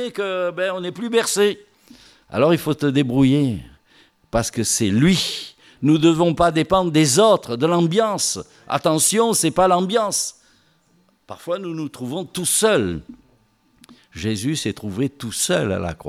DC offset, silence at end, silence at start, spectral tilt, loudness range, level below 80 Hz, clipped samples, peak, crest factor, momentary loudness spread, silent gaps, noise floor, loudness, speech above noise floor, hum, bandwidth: under 0.1%; 0 s; 0 s; -4.5 dB/octave; 6 LU; -48 dBFS; under 0.1%; -4 dBFS; 16 dB; 12 LU; none; -60 dBFS; -19 LUFS; 41 dB; none; 16 kHz